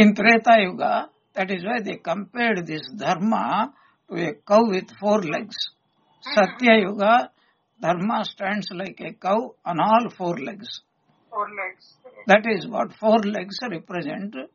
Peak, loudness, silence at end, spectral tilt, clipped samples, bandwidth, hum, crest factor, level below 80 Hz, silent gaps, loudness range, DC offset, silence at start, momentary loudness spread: 0 dBFS; -22 LUFS; 0.1 s; -3.5 dB/octave; under 0.1%; 7.2 kHz; none; 22 dB; -70 dBFS; none; 4 LU; under 0.1%; 0 s; 15 LU